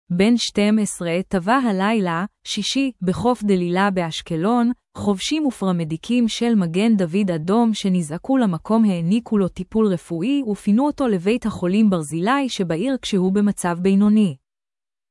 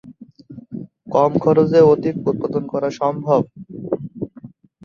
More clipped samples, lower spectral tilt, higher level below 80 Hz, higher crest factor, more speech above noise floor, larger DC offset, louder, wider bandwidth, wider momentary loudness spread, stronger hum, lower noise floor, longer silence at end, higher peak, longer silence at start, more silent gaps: neither; second, -6 dB/octave vs -8.5 dB/octave; first, -52 dBFS vs -58 dBFS; about the same, 14 dB vs 18 dB; first, over 71 dB vs 26 dB; neither; about the same, -20 LUFS vs -18 LUFS; first, 12 kHz vs 7 kHz; second, 5 LU vs 21 LU; neither; first, under -90 dBFS vs -42 dBFS; first, 0.75 s vs 0.4 s; second, -6 dBFS vs -2 dBFS; about the same, 0.1 s vs 0.05 s; neither